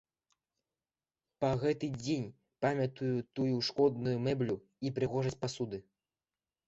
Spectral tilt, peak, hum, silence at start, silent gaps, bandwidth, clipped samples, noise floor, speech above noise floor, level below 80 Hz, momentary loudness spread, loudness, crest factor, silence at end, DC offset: -6.5 dB/octave; -16 dBFS; none; 1.4 s; none; 8.2 kHz; under 0.1%; under -90 dBFS; over 57 dB; -66 dBFS; 8 LU; -34 LUFS; 20 dB; 0.85 s; under 0.1%